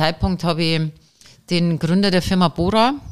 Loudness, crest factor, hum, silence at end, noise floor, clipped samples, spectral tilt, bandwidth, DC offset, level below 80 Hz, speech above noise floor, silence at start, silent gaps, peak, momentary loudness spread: -19 LUFS; 16 dB; none; 0 s; -48 dBFS; under 0.1%; -6 dB/octave; 13.5 kHz; 1%; -36 dBFS; 30 dB; 0 s; none; -2 dBFS; 5 LU